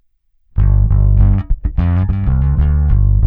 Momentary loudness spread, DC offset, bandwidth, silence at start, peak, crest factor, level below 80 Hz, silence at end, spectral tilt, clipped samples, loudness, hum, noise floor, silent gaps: 5 LU; under 0.1%; 3.1 kHz; 0.55 s; 0 dBFS; 12 dB; -14 dBFS; 0 s; -12 dB/octave; under 0.1%; -15 LUFS; none; -56 dBFS; none